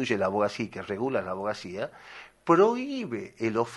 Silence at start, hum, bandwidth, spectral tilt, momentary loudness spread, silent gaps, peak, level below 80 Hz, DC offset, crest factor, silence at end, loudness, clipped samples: 0 s; none; 11.5 kHz; -6 dB/octave; 15 LU; none; -8 dBFS; -68 dBFS; under 0.1%; 20 dB; 0 s; -28 LUFS; under 0.1%